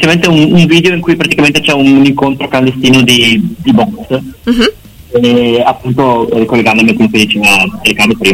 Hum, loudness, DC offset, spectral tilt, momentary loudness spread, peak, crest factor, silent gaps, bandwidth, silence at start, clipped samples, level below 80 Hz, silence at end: none; -8 LUFS; under 0.1%; -5 dB/octave; 6 LU; 0 dBFS; 8 dB; none; 16.5 kHz; 0 s; 0.2%; -36 dBFS; 0 s